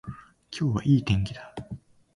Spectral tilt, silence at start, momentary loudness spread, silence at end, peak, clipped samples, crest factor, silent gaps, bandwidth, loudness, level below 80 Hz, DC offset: -7 dB/octave; 0.05 s; 21 LU; 0.4 s; -10 dBFS; under 0.1%; 18 dB; none; 11 kHz; -26 LUFS; -46 dBFS; under 0.1%